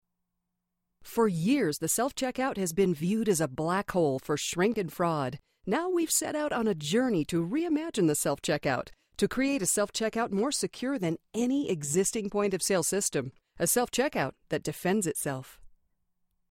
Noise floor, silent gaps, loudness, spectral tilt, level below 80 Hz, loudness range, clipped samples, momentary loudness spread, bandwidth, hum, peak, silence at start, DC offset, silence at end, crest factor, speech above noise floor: -83 dBFS; none; -29 LUFS; -4 dB/octave; -60 dBFS; 1 LU; under 0.1%; 6 LU; 16.5 kHz; none; -12 dBFS; 1 s; under 0.1%; 0.85 s; 16 dB; 54 dB